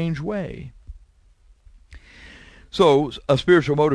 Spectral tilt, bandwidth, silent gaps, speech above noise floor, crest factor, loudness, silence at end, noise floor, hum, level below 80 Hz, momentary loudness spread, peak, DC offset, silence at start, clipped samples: -6.5 dB/octave; 11 kHz; none; 35 dB; 18 dB; -19 LUFS; 0 s; -54 dBFS; none; -46 dBFS; 18 LU; -4 dBFS; under 0.1%; 0 s; under 0.1%